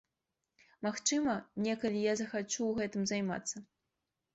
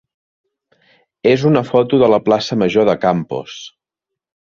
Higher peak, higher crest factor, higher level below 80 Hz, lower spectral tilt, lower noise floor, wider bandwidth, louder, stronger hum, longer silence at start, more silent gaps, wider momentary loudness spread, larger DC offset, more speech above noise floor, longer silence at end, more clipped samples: second, -18 dBFS vs -2 dBFS; about the same, 18 dB vs 16 dB; second, -70 dBFS vs -54 dBFS; second, -3.5 dB/octave vs -6.5 dB/octave; first, -88 dBFS vs -83 dBFS; first, 8.2 kHz vs 7.2 kHz; second, -35 LUFS vs -15 LUFS; neither; second, 0.8 s vs 1.25 s; neither; second, 7 LU vs 13 LU; neither; second, 53 dB vs 69 dB; second, 0.7 s vs 0.9 s; neither